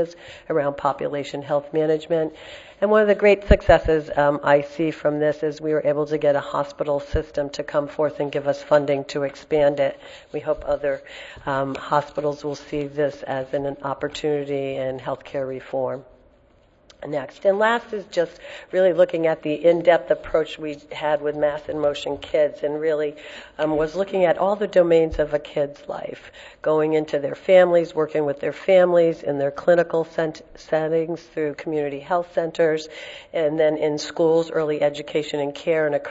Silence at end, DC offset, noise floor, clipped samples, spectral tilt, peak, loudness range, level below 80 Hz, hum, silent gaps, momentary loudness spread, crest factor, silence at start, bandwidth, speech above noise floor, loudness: 0 s; under 0.1%; -56 dBFS; under 0.1%; -6 dB/octave; 0 dBFS; 7 LU; -40 dBFS; none; none; 12 LU; 22 dB; 0 s; 8 kHz; 35 dB; -22 LUFS